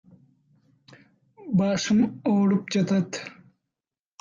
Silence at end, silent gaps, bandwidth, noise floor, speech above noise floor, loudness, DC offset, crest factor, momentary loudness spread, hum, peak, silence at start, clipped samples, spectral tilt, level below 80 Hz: 0.9 s; none; 7.4 kHz; -90 dBFS; 67 dB; -24 LUFS; under 0.1%; 14 dB; 14 LU; none; -12 dBFS; 1.4 s; under 0.1%; -6 dB/octave; -64 dBFS